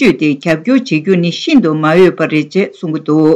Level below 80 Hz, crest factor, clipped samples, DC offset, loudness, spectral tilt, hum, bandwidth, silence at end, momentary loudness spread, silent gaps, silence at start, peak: -52 dBFS; 10 dB; under 0.1%; under 0.1%; -12 LUFS; -6.5 dB/octave; none; 9.8 kHz; 0 s; 7 LU; none; 0 s; 0 dBFS